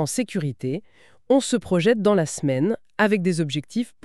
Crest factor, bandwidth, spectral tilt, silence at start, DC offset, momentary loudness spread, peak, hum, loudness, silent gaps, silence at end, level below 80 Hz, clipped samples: 18 dB; 13.5 kHz; -5.5 dB/octave; 0 s; 0.3%; 9 LU; -4 dBFS; none; -22 LUFS; none; 0.15 s; -60 dBFS; under 0.1%